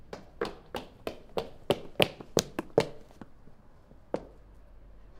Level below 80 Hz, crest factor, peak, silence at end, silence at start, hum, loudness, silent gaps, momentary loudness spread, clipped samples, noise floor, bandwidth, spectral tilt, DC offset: -54 dBFS; 36 dB; 0 dBFS; 0 s; 0.05 s; none; -33 LUFS; none; 23 LU; under 0.1%; -54 dBFS; 16.5 kHz; -4 dB/octave; under 0.1%